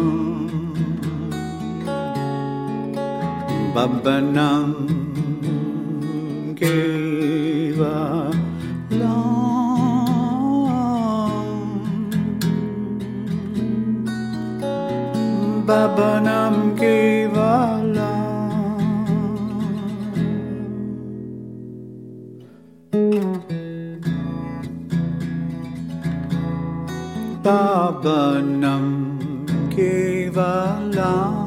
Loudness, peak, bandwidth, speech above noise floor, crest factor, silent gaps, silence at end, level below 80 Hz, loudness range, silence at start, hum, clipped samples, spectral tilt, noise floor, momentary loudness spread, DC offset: -21 LUFS; -4 dBFS; 16 kHz; 28 dB; 18 dB; none; 0 s; -54 dBFS; 7 LU; 0 s; none; under 0.1%; -7.5 dB/octave; -45 dBFS; 10 LU; under 0.1%